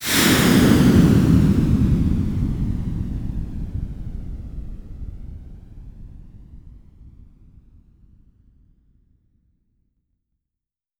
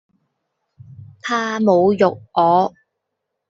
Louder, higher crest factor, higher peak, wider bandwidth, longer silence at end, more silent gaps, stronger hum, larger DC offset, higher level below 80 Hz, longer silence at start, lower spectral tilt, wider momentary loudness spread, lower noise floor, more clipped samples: about the same, -18 LUFS vs -17 LUFS; about the same, 20 dB vs 18 dB; about the same, -2 dBFS vs -2 dBFS; first, over 20 kHz vs 7.8 kHz; first, 3.9 s vs 0.8 s; neither; neither; neither; first, -30 dBFS vs -62 dBFS; second, 0 s vs 1 s; about the same, -5.5 dB/octave vs -6 dB/octave; first, 23 LU vs 9 LU; first, -87 dBFS vs -78 dBFS; neither